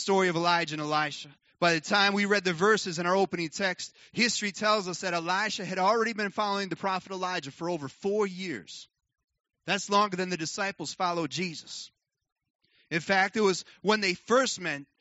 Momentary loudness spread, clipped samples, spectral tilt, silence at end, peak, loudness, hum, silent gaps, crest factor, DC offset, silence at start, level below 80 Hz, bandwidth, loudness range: 11 LU; under 0.1%; -2.5 dB/octave; 0.15 s; -8 dBFS; -28 LUFS; none; 9.24-9.28 s, 12.32-12.36 s, 12.50-12.59 s; 20 dB; under 0.1%; 0 s; -76 dBFS; 8 kHz; 6 LU